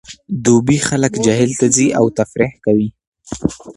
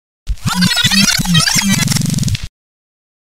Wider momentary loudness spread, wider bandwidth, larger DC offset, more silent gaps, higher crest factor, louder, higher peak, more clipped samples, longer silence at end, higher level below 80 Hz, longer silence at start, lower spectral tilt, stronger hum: about the same, 10 LU vs 12 LU; second, 11.5 kHz vs 16.5 kHz; second, under 0.1% vs 3%; first, 3.07-3.12 s vs none; about the same, 16 dB vs 14 dB; second, -15 LUFS vs -12 LUFS; about the same, 0 dBFS vs 0 dBFS; neither; second, 0.05 s vs 0.85 s; second, -44 dBFS vs -30 dBFS; second, 0.1 s vs 0.25 s; first, -5 dB/octave vs -2.5 dB/octave; neither